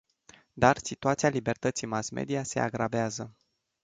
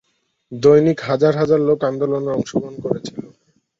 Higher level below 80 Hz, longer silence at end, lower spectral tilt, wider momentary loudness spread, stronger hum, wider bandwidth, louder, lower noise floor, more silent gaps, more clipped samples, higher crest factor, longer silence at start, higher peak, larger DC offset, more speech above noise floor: about the same, -58 dBFS vs -56 dBFS; about the same, 0.55 s vs 0.55 s; second, -5 dB/octave vs -7.5 dB/octave; second, 8 LU vs 13 LU; neither; first, 9.6 kHz vs 7.6 kHz; second, -29 LUFS vs -17 LUFS; first, -59 dBFS vs -55 dBFS; neither; neither; first, 24 dB vs 16 dB; about the same, 0.55 s vs 0.5 s; second, -6 dBFS vs -2 dBFS; neither; second, 31 dB vs 39 dB